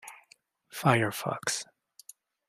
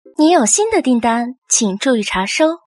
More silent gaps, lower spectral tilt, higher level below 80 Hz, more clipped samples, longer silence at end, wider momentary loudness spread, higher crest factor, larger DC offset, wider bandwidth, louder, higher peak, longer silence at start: second, none vs 1.38-1.42 s; about the same, -4 dB/octave vs -3 dB/octave; second, -70 dBFS vs -50 dBFS; neither; first, 0.85 s vs 0.1 s; first, 24 LU vs 5 LU; first, 26 dB vs 14 dB; neither; first, 16 kHz vs 11.5 kHz; second, -29 LUFS vs -14 LUFS; second, -6 dBFS vs -2 dBFS; second, 0.05 s vs 0.2 s